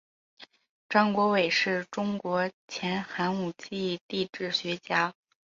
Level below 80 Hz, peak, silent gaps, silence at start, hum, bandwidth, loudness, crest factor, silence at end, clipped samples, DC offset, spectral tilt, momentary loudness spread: -72 dBFS; -8 dBFS; 0.69-0.89 s, 2.54-2.68 s, 4.01-4.09 s; 0.4 s; none; 7.6 kHz; -29 LUFS; 20 dB; 0.45 s; under 0.1%; under 0.1%; -5 dB/octave; 9 LU